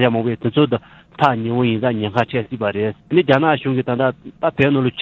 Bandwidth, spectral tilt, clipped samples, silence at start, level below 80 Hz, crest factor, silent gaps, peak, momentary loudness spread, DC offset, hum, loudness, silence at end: 7.6 kHz; -8.5 dB/octave; under 0.1%; 0 s; -52 dBFS; 18 dB; none; 0 dBFS; 7 LU; under 0.1%; none; -18 LUFS; 0 s